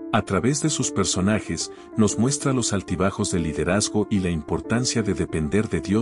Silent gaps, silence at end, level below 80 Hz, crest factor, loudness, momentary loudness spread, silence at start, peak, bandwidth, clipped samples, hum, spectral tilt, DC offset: none; 0 s; -46 dBFS; 18 dB; -23 LUFS; 4 LU; 0 s; -6 dBFS; 11.5 kHz; under 0.1%; none; -4.5 dB/octave; under 0.1%